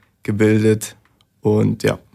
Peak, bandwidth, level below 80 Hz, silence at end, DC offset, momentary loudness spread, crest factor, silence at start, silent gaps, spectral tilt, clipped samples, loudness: -4 dBFS; 15 kHz; -52 dBFS; 0.2 s; under 0.1%; 10 LU; 14 dB; 0.3 s; none; -6.5 dB/octave; under 0.1%; -18 LUFS